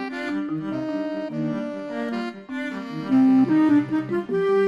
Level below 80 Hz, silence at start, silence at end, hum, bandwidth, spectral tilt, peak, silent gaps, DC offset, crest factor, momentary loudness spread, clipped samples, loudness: -66 dBFS; 0 s; 0 s; none; 7.8 kHz; -8 dB/octave; -10 dBFS; none; under 0.1%; 14 dB; 13 LU; under 0.1%; -23 LUFS